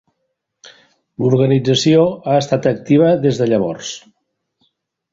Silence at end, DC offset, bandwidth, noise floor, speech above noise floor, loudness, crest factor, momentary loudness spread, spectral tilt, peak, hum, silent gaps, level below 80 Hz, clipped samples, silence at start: 1.15 s; under 0.1%; 7.8 kHz; -73 dBFS; 58 dB; -15 LUFS; 16 dB; 10 LU; -6 dB/octave; -2 dBFS; none; none; -54 dBFS; under 0.1%; 1.2 s